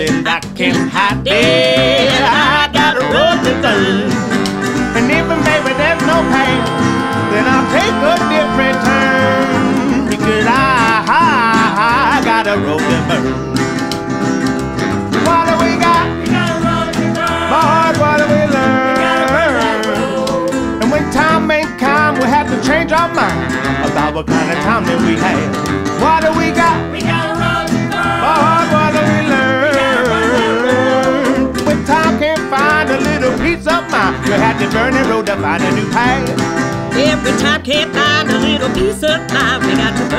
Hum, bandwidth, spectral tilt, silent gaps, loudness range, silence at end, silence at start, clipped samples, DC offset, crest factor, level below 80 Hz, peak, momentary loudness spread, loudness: none; 15.5 kHz; -5 dB/octave; none; 2 LU; 0 s; 0 s; under 0.1%; under 0.1%; 12 dB; -34 dBFS; 0 dBFS; 5 LU; -12 LUFS